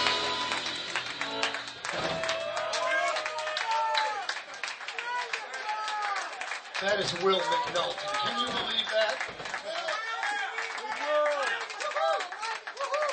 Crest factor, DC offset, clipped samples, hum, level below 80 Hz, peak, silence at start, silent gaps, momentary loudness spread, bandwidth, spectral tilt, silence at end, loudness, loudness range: 20 dB; under 0.1%; under 0.1%; none; -68 dBFS; -10 dBFS; 0 s; none; 8 LU; 9.2 kHz; -1.5 dB/octave; 0 s; -30 LUFS; 3 LU